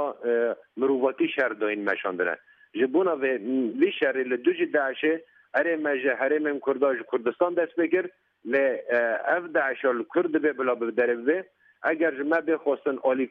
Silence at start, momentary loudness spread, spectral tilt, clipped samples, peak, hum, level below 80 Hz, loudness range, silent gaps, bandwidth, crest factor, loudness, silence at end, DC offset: 0 s; 4 LU; -7.5 dB/octave; under 0.1%; -10 dBFS; none; -80 dBFS; 1 LU; none; 4.9 kHz; 16 dB; -26 LUFS; 0.05 s; under 0.1%